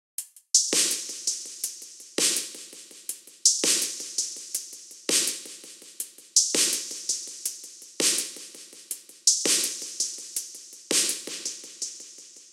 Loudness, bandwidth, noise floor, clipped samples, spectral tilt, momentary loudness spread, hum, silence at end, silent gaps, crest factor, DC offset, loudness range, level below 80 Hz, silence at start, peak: -25 LUFS; 17 kHz; -47 dBFS; under 0.1%; 1.5 dB/octave; 19 LU; none; 0.05 s; none; 24 dB; under 0.1%; 1 LU; -86 dBFS; 0.2 s; -4 dBFS